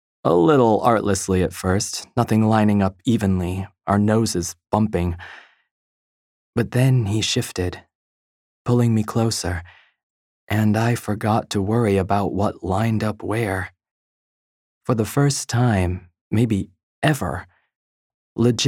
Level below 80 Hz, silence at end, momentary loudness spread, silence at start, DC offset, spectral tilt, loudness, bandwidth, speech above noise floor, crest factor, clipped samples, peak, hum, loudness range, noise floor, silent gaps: -48 dBFS; 0 s; 11 LU; 0.25 s; under 0.1%; -6 dB/octave; -21 LUFS; 16.5 kHz; over 71 dB; 20 dB; under 0.1%; -2 dBFS; none; 4 LU; under -90 dBFS; 5.71-6.53 s, 7.95-8.65 s, 10.03-10.47 s, 13.91-14.81 s, 16.21-16.31 s, 16.83-17.02 s, 17.76-18.36 s